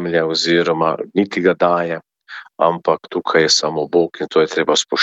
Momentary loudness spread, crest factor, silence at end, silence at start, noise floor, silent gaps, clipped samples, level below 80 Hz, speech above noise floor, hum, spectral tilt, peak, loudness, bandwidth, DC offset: 8 LU; 16 dB; 0 s; 0 s; -38 dBFS; none; under 0.1%; -60 dBFS; 21 dB; none; -3.5 dB/octave; -2 dBFS; -16 LUFS; 8.2 kHz; under 0.1%